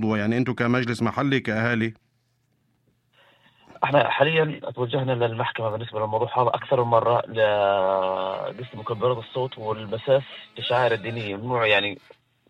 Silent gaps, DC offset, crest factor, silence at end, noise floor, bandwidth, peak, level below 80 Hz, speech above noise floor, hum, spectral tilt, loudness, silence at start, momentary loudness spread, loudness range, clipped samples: none; under 0.1%; 20 dB; 0.5 s; -69 dBFS; 11 kHz; -4 dBFS; -62 dBFS; 45 dB; none; -7 dB/octave; -24 LUFS; 0 s; 10 LU; 3 LU; under 0.1%